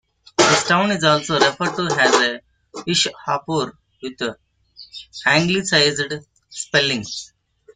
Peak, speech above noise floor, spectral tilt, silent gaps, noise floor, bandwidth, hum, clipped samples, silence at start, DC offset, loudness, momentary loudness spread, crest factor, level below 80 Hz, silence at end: 0 dBFS; 27 dB; -3 dB/octave; none; -46 dBFS; 9.6 kHz; none; under 0.1%; 0.4 s; under 0.1%; -18 LUFS; 19 LU; 20 dB; -58 dBFS; 0.5 s